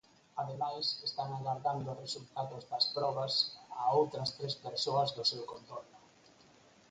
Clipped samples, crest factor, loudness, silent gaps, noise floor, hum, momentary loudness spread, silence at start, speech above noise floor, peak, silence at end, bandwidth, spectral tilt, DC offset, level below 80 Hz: under 0.1%; 20 dB; -35 LUFS; none; -63 dBFS; none; 11 LU; 0.35 s; 27 dB; -16 dBFS; 0.9 s; 9.4 kHz; -4.5 dB/octave; under 0.1%; -76 dBFS